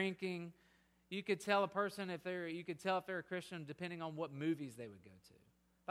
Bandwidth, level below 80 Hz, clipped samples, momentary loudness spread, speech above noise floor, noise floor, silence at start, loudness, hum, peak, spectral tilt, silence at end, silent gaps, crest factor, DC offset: 16 kHz; -82 dBFS; under 0.1%; 15 LU; 31 dB; -73 dBFS; 0 s; -42 LUFS; none; -20 dBFS; -5.5 dB/octave; 0.6 s; none; 24 dB; under 0.1%